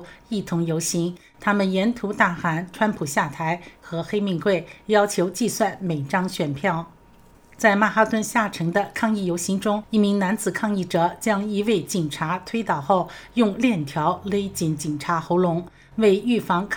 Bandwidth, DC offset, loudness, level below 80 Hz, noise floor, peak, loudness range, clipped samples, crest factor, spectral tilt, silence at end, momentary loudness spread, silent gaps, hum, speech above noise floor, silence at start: 19.5 kHz; under 0.1%; -23 LUFS; -56 dBFS; -51 dBFS; -2 dBFS; 2 LU; under 0.1%; 20 dB; -5 dB/octave; 0 s; 7 LU; none; none; 29 dB; 0 s